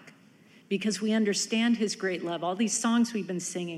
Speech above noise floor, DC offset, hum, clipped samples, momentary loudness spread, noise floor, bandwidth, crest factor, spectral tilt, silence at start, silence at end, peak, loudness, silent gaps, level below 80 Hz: 29 dB; under 0.1%; none; under 0.1%; 7 LU; -57 dBFS; 13 kHz; 14 dB; -3.5 dB/octave; 0.05 s; 0 s; -16 dBFS; -28 LUFS; none; -82 dBFS